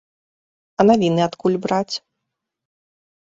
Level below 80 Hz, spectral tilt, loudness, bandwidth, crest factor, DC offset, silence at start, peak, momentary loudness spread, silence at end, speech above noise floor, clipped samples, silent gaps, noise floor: -60 dBFS; -6.5 dB/octave; -18 LUFS; 7.8 kHz; 20 dB; under 0.1%; 0.8 s; -2 dBFS; 14 LU; 1.3 s; 63 dB; under 0.1%; none; -80 dBFS